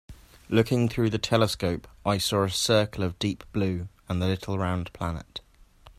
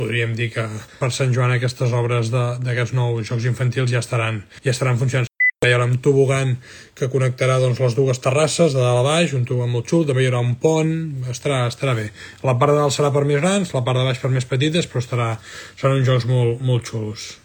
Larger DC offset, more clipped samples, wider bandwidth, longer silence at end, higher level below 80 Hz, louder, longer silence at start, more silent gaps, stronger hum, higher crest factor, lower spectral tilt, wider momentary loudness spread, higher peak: neither; neither; second, 15 kHz vs 17.5 kHz; about the same, 0.1 s vs 0.1 s; first, -50 dBFS vs -56 dBFS; second, -27 LUFS vs -19 LUFS; about the same, 0.1 s vs 0 s; neither; neither; about the same, 22 dB vs 18 dB; about the same, -5 dB/octave vs -5.5 dB/octave; about the same, 10 LU vs 8 LU; second, -6 dBFS vs -2 dBFS